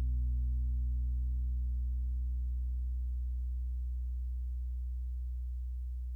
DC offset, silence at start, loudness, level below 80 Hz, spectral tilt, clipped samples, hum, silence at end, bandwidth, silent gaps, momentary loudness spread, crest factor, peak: under 0.1%; 0 s; -38 LUFS; -34 dBFS; -9.5 dB/octave; under 0.1%; none; 0 s; 0.3 kHz; none; 5 LU; 8 dB; -28 dBFS